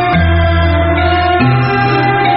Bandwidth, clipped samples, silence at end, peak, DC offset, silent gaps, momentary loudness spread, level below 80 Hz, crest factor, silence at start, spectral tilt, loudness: 5.8 kHz; under 0.1%; 0 s; 0 dBFS; under 0.1%; none; 1 LU; -22 dBFS; 10 dB; 0 s; -5 dB/octave; -11 LUFS